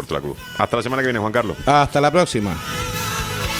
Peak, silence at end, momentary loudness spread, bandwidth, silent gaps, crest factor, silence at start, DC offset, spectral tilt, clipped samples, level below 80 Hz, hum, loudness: -2 dBFS; 0 s; 9 LU; over 20 kHz; none; 18 dB; 0 s; under 0.1%; -4.5 dB/octave; under 0.1%; -38 dBFS; none; -20 LUFS